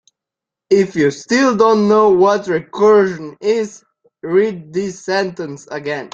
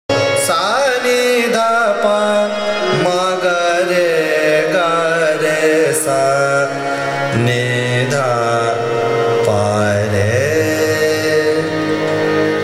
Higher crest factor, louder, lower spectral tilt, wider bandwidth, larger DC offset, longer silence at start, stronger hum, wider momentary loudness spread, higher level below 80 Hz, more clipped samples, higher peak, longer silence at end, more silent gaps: about the same, 14 dB vs 14 dB; about the same, -15 LUFS vs -14 LUFS; about the same, -5.5 dB/octave vs -4.5 dB/octave; second, 7.8 kHz vs 16 kHz; neither; first, 0.7 s vs 0.1 s; neither; first, 12 LU vs 3 LU; about the same, -58 dBFS vs -56 dBFS; neither; about the same, -2 dBFS vs -2 dBFS; about the same, 0.05 s vs 0 s; neither